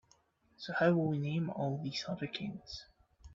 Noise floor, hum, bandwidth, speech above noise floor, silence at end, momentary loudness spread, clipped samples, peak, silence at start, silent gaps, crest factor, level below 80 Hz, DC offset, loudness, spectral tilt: -71 dBFS; none; 7.6 kHz; 36 dB; 0 s; 17 LU; under 0.1%; -16 dBFS; 0.6 s; none; 20 dB; -66 dBFS; under 0.1%; -35 LUFS; -5.5 dB/octave